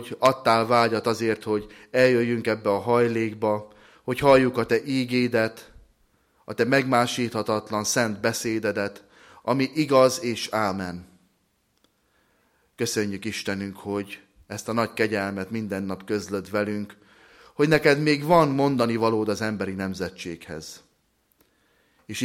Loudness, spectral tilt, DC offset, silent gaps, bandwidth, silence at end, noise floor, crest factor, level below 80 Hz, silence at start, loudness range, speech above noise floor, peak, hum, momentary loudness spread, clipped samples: -24 LUFS; -5 dB/octave; under 0.1%; none; 16.5 kHz; 0 s; -69 dBFS; 20 dB; -58 dBFS; 0 s; 8 LU; 46 dB; -6 dBFS; none; 15 LU; under 0.1%